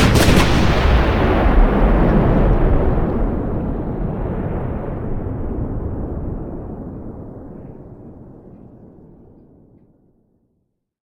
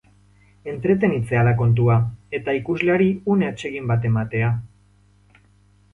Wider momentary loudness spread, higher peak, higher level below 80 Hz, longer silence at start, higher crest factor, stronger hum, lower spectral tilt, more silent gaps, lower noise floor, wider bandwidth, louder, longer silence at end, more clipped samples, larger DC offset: first, 20 LU vs 10 LU; first, -2 dBFS vs -6 dBFS; first, -22 dBFS vs -48 dBFS; second, 0 s vs 0.65 s; about the same, 16 dB vs 16 dB; second, none vs 50 Hz at -40 dBFS; second, -6.5 dB/octave vs -9 dB/octave; neither; first, -69 dBFS vs -56 dBFS; first, 16.5 kHz vs 7.6 kHz; first, -18 LUFS vs -21 LUFS; first, 2.3 s vs 1.25 s; neither; neither